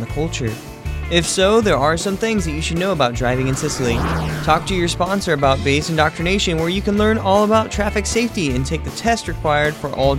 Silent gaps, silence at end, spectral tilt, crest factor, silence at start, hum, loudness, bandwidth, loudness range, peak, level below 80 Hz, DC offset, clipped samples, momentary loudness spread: none; 0 s; -4.5 dB/octave; 16 dB; 0 s; none; -18 LUFS; 16.5 kHz; 2 LU; -2 dBFS; -32 dBFS; under 0.1%; under 0.1%; 7 LU